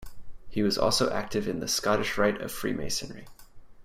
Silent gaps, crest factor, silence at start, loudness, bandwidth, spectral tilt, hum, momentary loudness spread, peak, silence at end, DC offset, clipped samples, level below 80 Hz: none; 18 dB; 0 s; -28 LUFS; 16 kHz; -3.5 dB/octave; none; 9 LU; -10 dBFS; 0 s; under 0.1%; under 0.1%; -48 dBFS